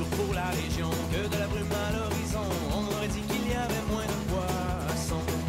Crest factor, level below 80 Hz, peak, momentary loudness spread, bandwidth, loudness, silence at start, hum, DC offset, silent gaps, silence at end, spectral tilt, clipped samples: 10 dB; -38 dBFS; -18 dBFS; 1 LU; 16 kHz; -30 LUFS; 0 s; none; under 0.1%; none; 0 s; -5 dB/octave; under 0.1%